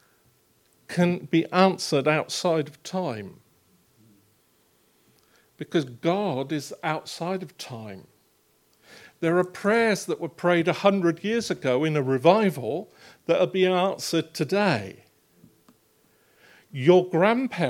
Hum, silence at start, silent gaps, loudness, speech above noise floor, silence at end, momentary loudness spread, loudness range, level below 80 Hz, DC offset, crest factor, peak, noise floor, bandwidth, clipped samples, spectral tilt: none; 0.9 s; none; -24 LUFS; 41 dB; 0 s; 14 LU; 9 LU; -74 dBFS; under 0.1%; 22 dB; -4 dBFS; -65 dBFS; 16 kHz; under 0.1%; -5.5 dB/octave